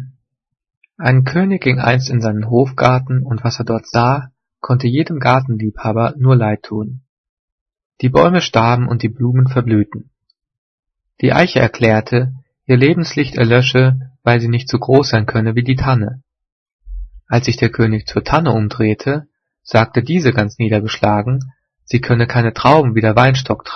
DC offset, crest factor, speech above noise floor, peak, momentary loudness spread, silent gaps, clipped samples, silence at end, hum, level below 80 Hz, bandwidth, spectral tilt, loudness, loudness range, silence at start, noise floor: under 0.1%; 14 dB; 33 dB; 0 dBFS; 9 LU; 0.77-0.81 s, 7.09-7.66 s, 7.85-7.90 s, 10.58-10.83 s, 16.52-16.66 s, 16.73-16.79 s; under 0.1%; 0 s; none; -40 dBFS; 6.6 kHz; -7 dB/octave; -14 LUFS; 3 LU; 0 s; -47 dBFS